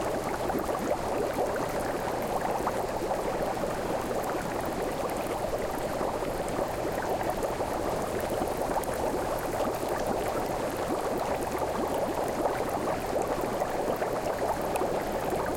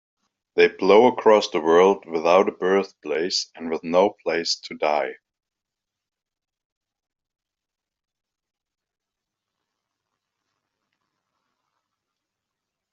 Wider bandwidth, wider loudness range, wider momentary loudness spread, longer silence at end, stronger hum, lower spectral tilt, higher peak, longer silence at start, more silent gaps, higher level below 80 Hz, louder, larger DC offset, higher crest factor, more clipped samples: first, 17 kHz vs 7.6 kHz; second, 1 LU vs 12 LU; second, 2 LU vs 11 LU; second, 0 s vs 7.8 s; neither; first, -5 dB/octave vs -2.5 dB/octave; second, -14 dBFS vs -2 dBFS; second, 0 s vs 0.55 s; neither; first, -46 dBFS vs -72 dBFS; second, -30 LUFS vs -20 LUFS; neither; second, 16 dB vs 22 dB; neither